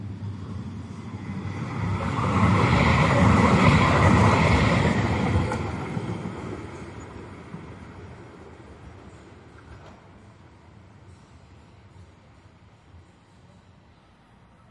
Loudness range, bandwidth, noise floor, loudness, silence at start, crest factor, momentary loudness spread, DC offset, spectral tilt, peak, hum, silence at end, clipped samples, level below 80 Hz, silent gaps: 23 LU; 11 kHz; -55 dBFS; -22 LUFS; 0 s; 20 dB; 25 LU; under 0.1%; -6.5 dB/octave; -4 dBFS; none; 2.65 s; under 0.1%; -40 dBFS; none